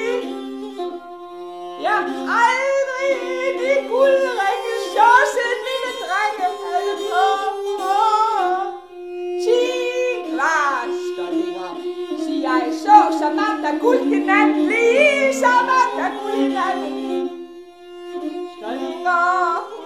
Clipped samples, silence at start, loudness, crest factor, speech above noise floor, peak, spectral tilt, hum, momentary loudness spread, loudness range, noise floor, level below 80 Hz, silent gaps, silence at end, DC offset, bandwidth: under 0.1%; 0 s; -19 LUFS; 18 dB; 22 dB; 0 dBFS; -2 dB/octave; none; 15 LU; 5 LU; -39 dBFS; -68 dBFS; none; 0 s; 0.1%; 15 kHz